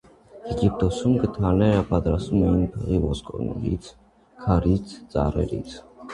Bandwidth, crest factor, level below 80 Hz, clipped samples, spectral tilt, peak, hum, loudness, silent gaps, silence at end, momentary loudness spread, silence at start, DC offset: 10.5 kHz; 18 dB; -34 dBFS; under 0.1%; -8 dB/octave; -4 dBFS; none; -24 LUFS; none; 0 s; 11 LU; 0.35 s; under 0.1%